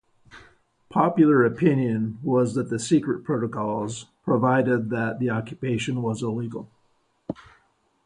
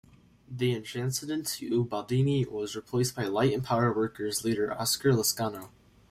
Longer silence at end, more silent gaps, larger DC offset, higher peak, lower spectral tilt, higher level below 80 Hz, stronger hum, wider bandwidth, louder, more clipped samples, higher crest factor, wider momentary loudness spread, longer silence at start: first, 0.65 s vs 0.45 s; neither; neither; first, -6 dBFS vs -12 dBFS; first, -7 dB/octave vs -5 dB/octave; about the same, -60 dBFS vs -60 dBFS; neither; second, 11 kHz vs 16 kHz; first, -24 LUFS vs -29 LUFS; neither; about the same, 18 dB vs 16 dB; first, 15 LU vs 7 LU; second, 0.35 s vs 0.5 s